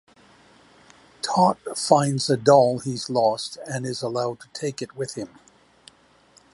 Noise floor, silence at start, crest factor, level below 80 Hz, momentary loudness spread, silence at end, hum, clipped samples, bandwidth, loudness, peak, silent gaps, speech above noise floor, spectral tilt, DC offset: -56 dBFS; 1.25 s; 22 dB; -66 dBFS; 14 LU; 1.25 s; none; under 0.1%; 11.5 kHz; -23 LUFS; -2 dBFS; none; 34 dB; -5 dB/octave; under 0.1%